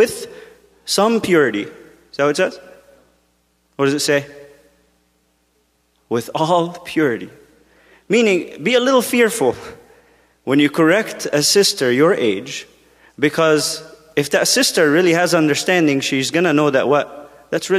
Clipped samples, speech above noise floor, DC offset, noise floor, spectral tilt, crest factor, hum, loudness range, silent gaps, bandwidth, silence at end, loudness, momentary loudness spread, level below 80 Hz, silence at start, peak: under 0.1%; 46 dB; under 0.1%; -62 dBFS; -3.5 dB/octave; 16 dB; none; 8 LU; none; 15.5 kHz; 0 s; -16 LUFS; 15 LU; -62 dBFS; 0 s; -2 dBFS